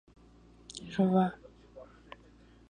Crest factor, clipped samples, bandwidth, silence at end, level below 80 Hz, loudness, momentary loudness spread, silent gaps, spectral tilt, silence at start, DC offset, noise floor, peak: 20 dB; under 0.1%; 9.6 kHz; 0.85 s; -62 dBFS; -30 LUFS; 26 LU; none; -7.5 dB/octave; 0.75 s; under 0.1%; -58 dBFS; -16 dBFS